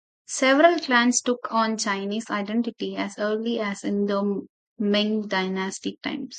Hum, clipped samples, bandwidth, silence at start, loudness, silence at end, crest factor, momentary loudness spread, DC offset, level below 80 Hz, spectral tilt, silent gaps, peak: none; under 0.1%; 9.4 kHz; 0.3 s; -24 LUFS; 0 s; 20 dB; 12 LU; under 0.1%; -74 dBFS; -3.5 dB/octave; 4.49-4.76 s; -4 dBFS